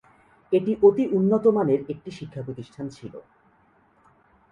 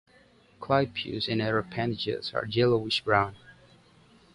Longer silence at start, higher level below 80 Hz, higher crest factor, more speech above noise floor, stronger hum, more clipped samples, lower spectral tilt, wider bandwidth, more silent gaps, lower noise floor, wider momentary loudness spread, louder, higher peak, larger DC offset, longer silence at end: about the same, 0.5 s vs 0.6 s; second, -64 dBFS vs -58 dBFS; about the same, 20 dB vs 22 dB; first, 38 dB vs 32 dB; neither; neither; first, -9 dB/octave vs -6.5 dB/octave; second, 7.2 kHz vs 11.5 kHz; neither; about the same, -61 dBFS vs -59 dBFS; first, 18 LU vs 7 LU; first, -21 LUFS vs -28 LUFS; about the same, -4 dBFS vs -6 dBFS; neither; first, 1.3 s vs 0.8 s